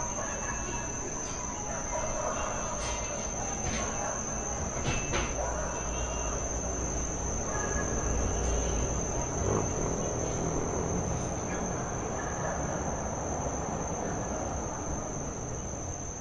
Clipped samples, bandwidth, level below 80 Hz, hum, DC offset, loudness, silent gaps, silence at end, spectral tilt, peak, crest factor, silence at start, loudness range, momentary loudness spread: under 0.1%; 11 kHz; -40 dBFS; none; under 0.1%; -32 LUFS; none; 0 s; -4 dB/octave; -16 dBFS; 16 dB; 0 s; 3 LU; 4 LU